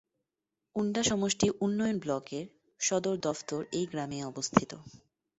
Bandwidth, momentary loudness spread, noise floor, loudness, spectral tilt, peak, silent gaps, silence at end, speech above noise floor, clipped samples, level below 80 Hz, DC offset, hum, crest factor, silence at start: 8.4 kHz; 12 LU; -88 dBFS; -32 LUFS; -4 dB/octave; -4 dBFS; none; 0.45 s; 57 dB; under 0.1%; -64 dBFS; under 0.1%; none; 28 dB; 0.75 s